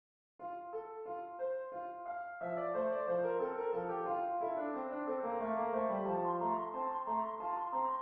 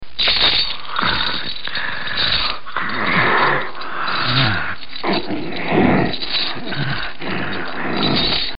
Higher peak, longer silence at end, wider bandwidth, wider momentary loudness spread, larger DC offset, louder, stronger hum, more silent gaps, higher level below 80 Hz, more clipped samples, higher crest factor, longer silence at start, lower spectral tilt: second, -24 dBFS vs -2 dBFS; about the same, 0 s vs 0 s; second, 4 kHz vs 5.6 kHz; about the same, 9 LU vs 10 LU; second, under 0.1% vs 7%; second, -38 LUFS vs -18 LUFS; neither; neither; second, -76 dBFS vs -40 dBFS; neither; about the same, 14 dB vs 18 dB; first, 0.4 s vs 0 s; second, -6.5 dB/octave vs -9.5 dB/octave